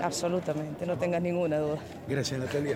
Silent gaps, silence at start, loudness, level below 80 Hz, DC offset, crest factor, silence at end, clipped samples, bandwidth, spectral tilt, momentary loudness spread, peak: none; 0 s; -31 LUFS; -60 dBFS; under 0.1%; 16 dB; 0 s; under 0.1%; 16.5 kHz; -5.5 dB/octave; 5 LU; -14 dBFS